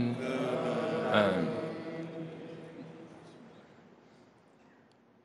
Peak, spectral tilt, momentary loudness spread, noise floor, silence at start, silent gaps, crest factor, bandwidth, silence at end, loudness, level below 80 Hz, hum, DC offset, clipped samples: -12 dBFS; -6.5 dB/octave; 25 LU; -63 dBFS; 0 s; none; 22 dB; 11.5 kHz; 1.45 s; -33 LUFS; -78 dBFS; none; under 0.1%; under 0.1%